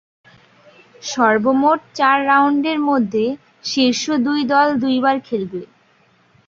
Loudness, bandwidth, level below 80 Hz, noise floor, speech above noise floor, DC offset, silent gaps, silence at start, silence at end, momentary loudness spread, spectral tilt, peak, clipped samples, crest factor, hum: -17 LUFS; 7.6 kHz; -64 dBFS; -56 dBFS; 39 dB; under 0.1%; none; 1.05 s; 0.8 s; 11 LU; -4 dB/octave; 0 dBFS; under 0.1%; 18 dB; none